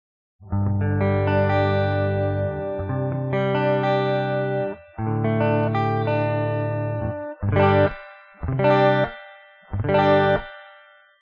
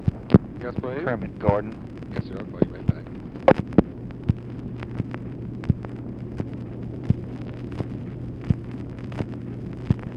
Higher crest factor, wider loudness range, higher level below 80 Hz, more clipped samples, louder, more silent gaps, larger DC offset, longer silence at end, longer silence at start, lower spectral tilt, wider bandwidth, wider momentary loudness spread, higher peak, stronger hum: second, 16 dB vs 26 dB; second, 3 LU vs 6 LU; about the same, -46 dBFS vs -42 dBFS; neither; first, -22 LUFS vs -27 LUFS; neither; neither; first, 0.5 s vs 0 s; first, 0.4 s vs 0 s; second, -6 dB/octave vs -10 dB/octave; second, 5.4 kHz vs 6.4 kHz; second, 11 LU vs 14 LU; second, -6 dBFS vs 0 dBFS; neither